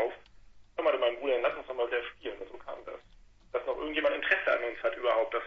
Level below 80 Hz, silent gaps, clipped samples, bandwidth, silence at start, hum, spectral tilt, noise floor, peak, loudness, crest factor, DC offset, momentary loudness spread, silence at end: -62 dBFS; none; under 0.1%; 6.4 kHz; 0 s; none; -4.5 dB/octave; -57 dBFS; -12 dBFS; -31 LUFS; 20 dB; under 0.1%; 16 LU; 0 s